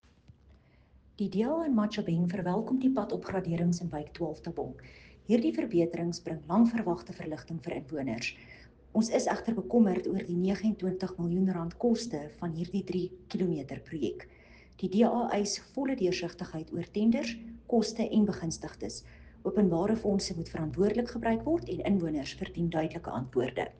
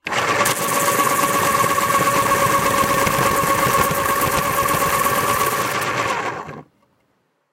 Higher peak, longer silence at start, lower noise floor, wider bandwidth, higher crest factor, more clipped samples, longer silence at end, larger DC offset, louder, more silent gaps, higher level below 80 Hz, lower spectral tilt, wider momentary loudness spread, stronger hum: second, -12 dBFS vs -4 dBFS; first, 1.2 s vs 0.05 s; second, -61 dBFS vs -66 dBFS; second, 9.4 kHz vs 17 kHz; about the same, 18 dB vs 16 dB; neither; second, 0.1 s vs 0.9 s; neither; second, -31 LUFS vs -17 LUFS; neither; second, -56 dBFS vs -44 dBFS; first, -6.5 dB/octave vs -3 dB/octave; first, 11 LU vs 4 LU; neither